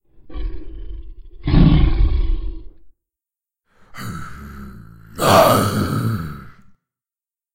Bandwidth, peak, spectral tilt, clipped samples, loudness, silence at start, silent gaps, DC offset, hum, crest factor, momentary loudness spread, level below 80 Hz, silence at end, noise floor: 16 kHz; 0 dBFS; -6 dB/octave; under 0.1%; -17 LUFS; 0.2 s; none; under 0.1%; none; 18 dB; 25 LU; -24 dBFS; 1.05 s; under -90 dBFS